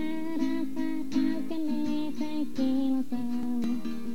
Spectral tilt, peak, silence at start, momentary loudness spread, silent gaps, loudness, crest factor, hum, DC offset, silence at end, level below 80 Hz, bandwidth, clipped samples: -6 dB/octave; -16 dBFS; 0 s; 5 LU; none; -31 LUFS; 12 dB; none; 3%; 0 s; -66 dBFS; 16.5 kHz; under 0.1%